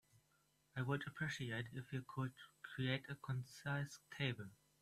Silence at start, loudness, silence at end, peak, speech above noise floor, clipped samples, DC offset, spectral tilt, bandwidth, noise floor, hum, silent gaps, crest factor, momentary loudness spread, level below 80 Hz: 0.75 s; -46 LUFS; 0.25 s; -24 dBFS; 34 dB; under 0.1%; under 0.1%; -5.5 dB/octave; 14 kHz; -79 dBFS; none; none; 22 dB; 10 LU; -76 dBFS